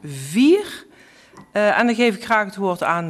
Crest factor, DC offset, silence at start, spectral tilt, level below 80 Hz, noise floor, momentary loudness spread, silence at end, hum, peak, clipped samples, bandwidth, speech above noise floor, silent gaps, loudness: 16 dB; under 0.1%; 0.05 s; -5 dB/octave; -64 dBFS; -49 dBFS; 11 LU; 0 s; none; -4 dBFS; under 0.1%; 13.5 kHz; 31 dB; none; -18 LUFS